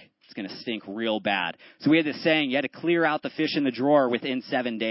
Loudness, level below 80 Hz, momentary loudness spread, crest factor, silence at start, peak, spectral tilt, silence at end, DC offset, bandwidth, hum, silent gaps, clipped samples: -25 LUFS; -74 dBFS; 11 LU; 18 dB; 0.35 s; -8 dBFS; -9 dB/octave; 0 s; under 0.1%; 5.8 kHz; none; none; under 0.1%